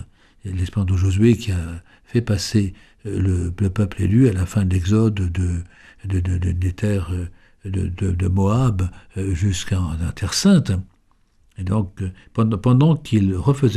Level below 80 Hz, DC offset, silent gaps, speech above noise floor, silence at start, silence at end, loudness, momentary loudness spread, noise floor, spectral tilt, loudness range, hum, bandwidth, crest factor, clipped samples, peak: -36 dBFS; under 0.1%; none; 39 dB; 0 s; 0 s; -20 LUFS; 13 LU; -58 dBFS; -6.5 dB/octave; 3 LU; none; 13 kHz; 16 dB; under 0.1%; -4 dBFS